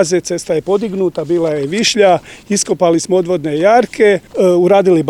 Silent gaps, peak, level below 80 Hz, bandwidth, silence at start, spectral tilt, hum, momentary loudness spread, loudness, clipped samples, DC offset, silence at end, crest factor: none; 0 dBFS; -52 dBFS; 13 kHz; 0 s; -4.5 dB/octave; none; 7 LU; -13 LUFS; under 0.1%; 0.1%; 0 s; 12 dB